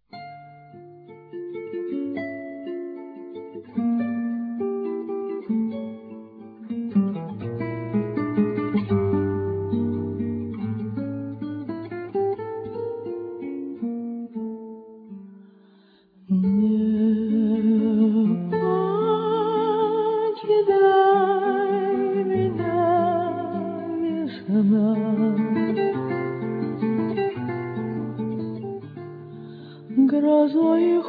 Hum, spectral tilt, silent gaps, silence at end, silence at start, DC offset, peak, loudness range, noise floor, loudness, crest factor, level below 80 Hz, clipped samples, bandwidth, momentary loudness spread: none; -11.5 dB/octave; none; 0 s; 0.15 s; under 0.1%; -8 dBFS; 10 LU; -55 dBFS; -24 LUFS; 16 dB; -64 dBFS; under 0.1%; 4.9 kHz; 18 LU